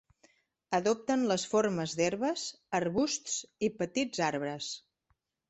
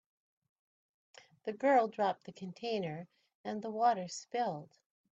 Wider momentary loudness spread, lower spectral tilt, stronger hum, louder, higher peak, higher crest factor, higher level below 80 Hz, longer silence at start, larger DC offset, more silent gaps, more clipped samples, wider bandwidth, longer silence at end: second, 7 LU vs 17 LU; about the same, -4 dB/octave vs -5 dB/octave; neither; first, -32 LUFS vs -35 LUFS; first, -14 dBFS vs -18 dBFS; about the same, 18 dB vs 20 dB; first, -70 dBFS vs -84 dBFS; second, 0.7 s vs 1.45 s; neither; second, none vs 3.35-3.44 s; neither; about the same, 8.4 kHz vs 8.4 kHz; first, 0.7 s vs 0.5 s